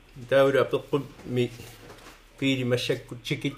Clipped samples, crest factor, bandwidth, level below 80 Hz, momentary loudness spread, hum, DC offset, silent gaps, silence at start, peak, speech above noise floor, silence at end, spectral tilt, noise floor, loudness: under 0.1%; 18 dB; 15.5 kHz; -56 dBFS; 22 LU; none; under 0.1%; none; 0.15 s; -10 dBFS; 23 dB; 0 s; -6 dB/octave; -49 dBFS; -26 LUFS